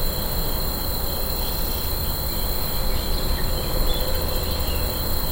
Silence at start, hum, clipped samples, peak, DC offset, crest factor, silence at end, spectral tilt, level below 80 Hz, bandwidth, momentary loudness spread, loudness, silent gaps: 0 s; none; under 0.1%; -8 dBFS; under 0.1%; 14 dB; 0 s; -4 dB/octave; -24 dBFS; 17 kHz; 1 LU; -25 LUFS; none